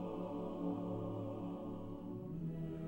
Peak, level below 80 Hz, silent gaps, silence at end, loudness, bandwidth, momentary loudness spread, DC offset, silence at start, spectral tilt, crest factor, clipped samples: -30 dBFS; -60 dBFS; none; 0 s; -44 LUFS; 16 kHz; 5 LU; under 0.1%; 0 s; -10 dB/octave; 14 dB; under 0.1%